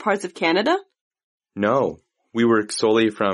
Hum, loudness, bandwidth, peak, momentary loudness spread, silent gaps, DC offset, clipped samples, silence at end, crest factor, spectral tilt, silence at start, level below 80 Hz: none; -21 LUFS; 11.5 kHz; -6 dBFS; 7 LU; 1.01-1.11 s, 1.24-1.38 s; under 0.1%; under 0.1%; 0 s; 16 dB; -4.5 dB/octave; 0 s; -64 dBFS